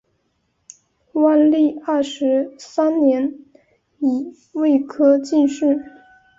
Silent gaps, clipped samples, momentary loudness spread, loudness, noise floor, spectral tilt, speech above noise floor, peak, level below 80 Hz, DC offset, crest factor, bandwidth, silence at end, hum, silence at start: none; under 0.1%; 10 LU; -18 LUFS; -68 dBFS; -5 dB/octave; 51 dB; -4 dBFS; -66 dBFS; under 0.1%; 14 dB; 7.8 kHz; 0.5 s; none; 1.15 s